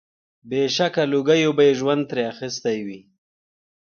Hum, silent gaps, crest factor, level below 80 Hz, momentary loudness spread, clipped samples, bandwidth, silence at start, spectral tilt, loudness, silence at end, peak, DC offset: none; none; 16 dB; -68 dBFS; 10 LU; under 0.1%; 7 kHz; 0.45 s; -5 dB/octave; -21 LUFS; 0.9 s; -6 dBFS; under 0.1%